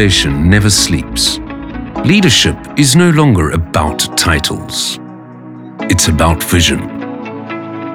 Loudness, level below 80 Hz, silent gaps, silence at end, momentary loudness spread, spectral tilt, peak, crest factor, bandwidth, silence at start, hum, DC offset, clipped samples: -11 LUFS; -28 dBFS; none; 0 s; 16 LU; -4 dB/octave; 0 dBFS; 12 dB; over 20 kHz; 0 s; none; under 0.1%; under 0.1%